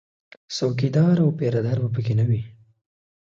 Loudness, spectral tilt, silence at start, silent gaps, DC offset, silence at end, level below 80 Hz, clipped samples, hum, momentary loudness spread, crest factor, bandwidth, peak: -22 LUFS; -7.5 dB/octave; 0.5 s; none; under 0.1%; 0.75 s; -56 dBFS; under 0.1%; none; 8 LU; 14 dB; 7.6 kHz; -8 dBFS